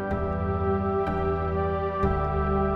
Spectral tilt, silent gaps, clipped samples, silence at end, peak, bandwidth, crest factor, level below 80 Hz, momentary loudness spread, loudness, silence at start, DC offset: -10 dB/octave; none; under 0.1%; 0 s; -12 dBFS; 5.4 kHz; 14 dB; -34 dBFS; 2 LU; -27 LUFS; 0 s; under 0.1%